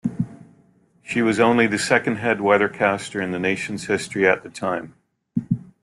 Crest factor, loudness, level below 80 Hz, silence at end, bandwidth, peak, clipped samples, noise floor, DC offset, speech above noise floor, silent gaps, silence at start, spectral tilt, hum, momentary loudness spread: 18 dB; -21 LUFS; -58 dBFS; 0.25 s; 12.5 kHz; -4 dBFS; under 0.1%; -57 dBFS; under 0.1%; 37 dB; none; 0.05 s; -5 dB/octave; none; 11 LU